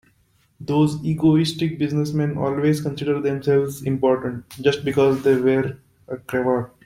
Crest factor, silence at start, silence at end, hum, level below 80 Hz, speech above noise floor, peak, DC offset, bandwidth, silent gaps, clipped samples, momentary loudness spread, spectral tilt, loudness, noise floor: 18 dB; 0.6 s; 0.2 s; none; -54 dBFS; 41 dB; -4 dBFS; under 0.1%; 16 kHz; none; under 0.1%; 7 LU; -7 dB/octave; -21 LUFS; -61 dBFS